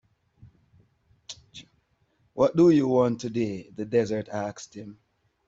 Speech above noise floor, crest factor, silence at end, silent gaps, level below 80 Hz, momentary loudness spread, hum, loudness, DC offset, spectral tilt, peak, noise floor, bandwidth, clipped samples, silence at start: 44 dB; 20 dB; 0.55 s; none; -64 dBFS; 24 LU; none; -25 LUFS; under 0.1%; -7 dB/octave; -8 dBFS; -69 dBFS; 7.8 kHz; under 0.1%; 1.3 s